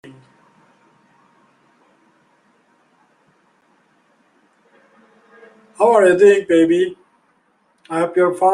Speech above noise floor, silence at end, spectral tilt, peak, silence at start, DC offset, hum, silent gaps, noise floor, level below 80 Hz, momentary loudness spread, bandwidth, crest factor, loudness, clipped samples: 48 dB; 0 s; -5.5 dB/octave; -2 dBFS; 5.8 s; under 0.1%; none; none; -61 dBFS; -68 dBFS; 11 LU; 11.5 kHz; 18 dB; -15 LUFS; under 0.1%